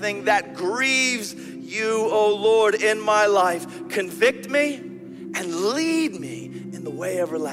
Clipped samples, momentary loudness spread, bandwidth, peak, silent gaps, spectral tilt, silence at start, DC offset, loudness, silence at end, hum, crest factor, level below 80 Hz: under 0.1%; 15 LU; 16 kHz; -4 dBFS; none; -3 dB/octave; 0 s; under 0.1%; -21 LUFS; 0 s; none; 18 dB; -70 dBFS